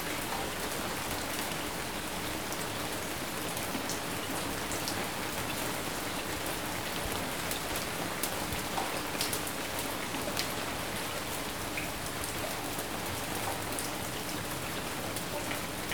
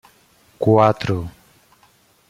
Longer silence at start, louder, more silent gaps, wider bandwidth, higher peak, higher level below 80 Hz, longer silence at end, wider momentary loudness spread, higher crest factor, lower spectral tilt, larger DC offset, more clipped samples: second, 0 s vs 0.6 s; second, -34 LUFS vs -18 LUFS; neither; first, over 20 kHz vs 14.5 kHz; second, -12 dBFS vs -2 dBFS; about the same, -52 dBFS vs -52 dBFS; second, 0 s vs 1 s; second, 2 LU vs 13 LU; about the same, 24 dB vs 20 dB; second, -2.5 dB/octave vs -8 dB/octave; first, 0.4% vs under 0.1%; neither